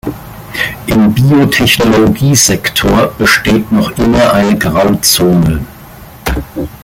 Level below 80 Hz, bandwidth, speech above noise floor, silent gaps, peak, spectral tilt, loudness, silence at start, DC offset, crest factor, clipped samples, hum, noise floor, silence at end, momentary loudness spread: -28 dBFS; 17.5 kHz; 23 dB; none; 0 dBFS; -4.5 dB/octave; -9 LUFS; 0.05 s; under 0.1%; 10 dB; under 0.1%; none; -32 dBFS; 0.05 s; 12 LU